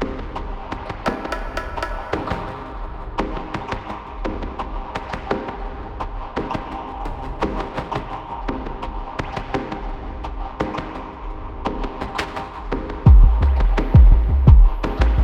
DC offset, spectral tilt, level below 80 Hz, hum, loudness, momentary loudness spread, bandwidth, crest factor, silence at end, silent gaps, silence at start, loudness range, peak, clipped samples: under 0.1%; -8 dB/octave; -20 dBFS; none; -22 LUFS; 17 LU; 6.8 kHz; 18 dB; 0 s; none; 0 s; 12 LU; 0 dBFS; under 0.1%